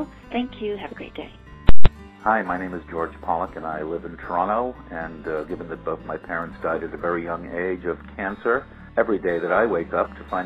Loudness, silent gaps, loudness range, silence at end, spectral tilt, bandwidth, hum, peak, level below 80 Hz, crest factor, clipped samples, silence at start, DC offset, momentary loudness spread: -26 LUFS; none; 4 LU; 0 s; -8.5 dB/octave; 4.5 kHz; none; 0 dBFS; -32 dBFS; 18 dB; 0.2%; 0 s; under 0.1%; 9 LU